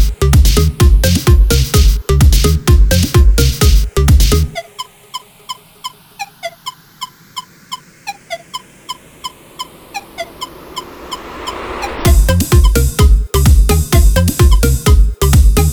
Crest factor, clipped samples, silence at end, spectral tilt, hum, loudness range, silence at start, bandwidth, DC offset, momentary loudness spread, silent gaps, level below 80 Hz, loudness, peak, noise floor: 10 dB; under 0.1%; 0 s; -5 dB/octave; none; 17 LU; 0 s; 19.5 kHz; under 0.1%; 19 LU; none; -12 dBFS; -11 LUFS; 0 dBFS; -31 dBFS